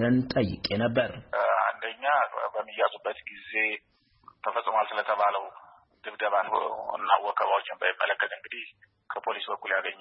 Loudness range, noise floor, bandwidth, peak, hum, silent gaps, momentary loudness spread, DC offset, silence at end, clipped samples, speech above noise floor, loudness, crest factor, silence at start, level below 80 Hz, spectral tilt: 2 LU; -57 dBFS; 5.8 kHz; -8 dBFS; none; none; 12 LU; under 0.1%; 0.05 s; under 0.1%; 28 dB; -28 LUFS; 20 dB; 0 s; -60 dBFS; -9 dB/octave